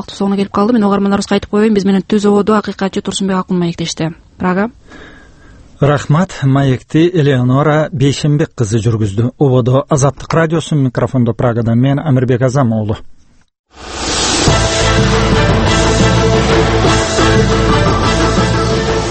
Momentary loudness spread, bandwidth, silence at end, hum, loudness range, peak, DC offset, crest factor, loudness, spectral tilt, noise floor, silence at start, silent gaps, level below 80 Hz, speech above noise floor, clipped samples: 6 LU; 8.8 kHz; 0 s; none; 5 LU; 0 dBFS; under 0.1%; 12 dB; -12 LUFS; -5.5 dB/octave; -39 dBFS; 0 s; 13.59-13.64 s; -26 dBFS; 27 dB; under 0.1%